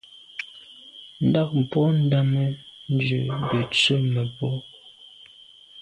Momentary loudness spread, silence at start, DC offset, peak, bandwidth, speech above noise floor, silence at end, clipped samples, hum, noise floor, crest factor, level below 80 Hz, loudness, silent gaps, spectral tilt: 20 LU; 0.35 s; under 0.1%; -8 dBFS; 10.5 kHz; 28 dB; 0 s; under 0.1%; none; -50 dBFS; 16 dB; -58 dBFS; -23 LUFS; none; -6.5 dB/octave